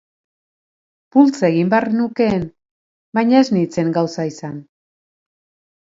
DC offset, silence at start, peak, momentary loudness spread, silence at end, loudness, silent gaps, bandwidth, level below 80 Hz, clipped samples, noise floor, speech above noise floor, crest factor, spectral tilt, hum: under 0.1%; 1.15 s; 0 dBFS; 14 LU; 1.25 s; -17 LUFS; 2.71-3.13 s; 7.8 kHz; -56 dBFS; under 0.1%; under -90 dBFS; over 74 dB; 18 dB; -7 dB/octave; none